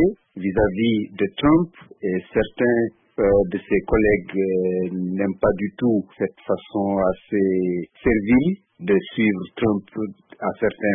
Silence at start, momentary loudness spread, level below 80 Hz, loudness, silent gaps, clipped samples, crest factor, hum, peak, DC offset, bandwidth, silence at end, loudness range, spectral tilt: 0 s; 9 LU; -42 dBFS; -22 LUFS; none; under 0.1%; 14 dB; none; -6 dBFS; under 0.1%; 3.8 kHz; 0 s; 2 LU; -12 dB/octave